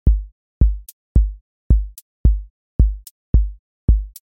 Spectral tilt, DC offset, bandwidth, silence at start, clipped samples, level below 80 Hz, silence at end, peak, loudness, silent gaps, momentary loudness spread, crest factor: -9.5 dB/octave; under 0.1%; 14.5 kHz; 0.05 s; under 0.1%; -18 dBFS; 0.2 s; -2 dBFS; -21 LUFS; 0.32-0.61 s, 0.93-1.15 s, 1.41-1.70 s, 2.02-2.24 s, 2.50-2.79 s, 3.11-3.33 s, 3.59-3.88 s; 10 LU; 16 dB